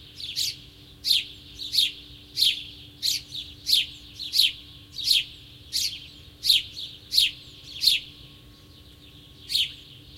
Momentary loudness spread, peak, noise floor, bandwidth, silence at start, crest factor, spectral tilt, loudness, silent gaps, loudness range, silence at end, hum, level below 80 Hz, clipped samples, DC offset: 19 LU; -6 dBFS; -50 dBFS; 16.5 kHz; 0 s; 24 dB; 1 dB/octave; -23 LUFS; none; 2 LU; 0 s; none; -56 dBFS; under 0.1%; under 0.1%